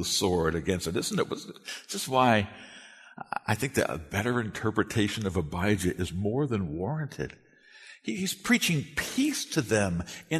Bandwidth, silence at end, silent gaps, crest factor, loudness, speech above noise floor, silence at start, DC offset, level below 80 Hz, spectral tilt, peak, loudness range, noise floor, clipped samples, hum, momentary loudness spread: 13.5 kHz; 0 s; none; 20 dB; -29 LUFS; 24 dB; 0 s; under 0.1%; -52 dBFS; -4.5 dB/octave; -8 dBFS; 2 LU; -52 dBFS; under 0.1%; none; 14 LU